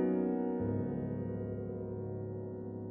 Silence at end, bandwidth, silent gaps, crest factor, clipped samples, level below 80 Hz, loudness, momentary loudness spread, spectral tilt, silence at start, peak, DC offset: 0 s; 3 kHz; none; 14 dB; under 0.1%; -60 dBFS; -38 LUFS; 8 LU; -11.5 dB/octave; 0 s; -22 dBFS; under 0.1%